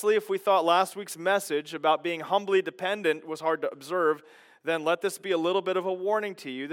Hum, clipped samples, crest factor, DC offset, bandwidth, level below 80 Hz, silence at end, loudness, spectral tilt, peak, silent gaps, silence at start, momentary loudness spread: none; under 0.1%; 18 dB; under 0.1%; 17.5 kHz; under -90 dBFS; 0 s; -27 LUFS; -3.5 dB/octave; -10 dBFS; none; 0 s; 7 LU